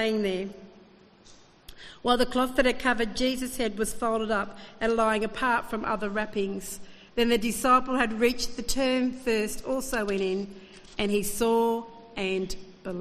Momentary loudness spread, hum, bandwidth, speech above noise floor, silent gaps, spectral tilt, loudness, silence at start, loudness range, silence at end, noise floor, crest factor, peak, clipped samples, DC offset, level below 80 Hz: 13 LU; none; 14.5 kHz; 28 dB; none; -3.5 dB/octave; -27 LUFS; 0 s; 3 LU; 0 s; -54 dBFS; 20 dB; -8 dBFS; under 0.1%; under 0.1%; -46 dBFS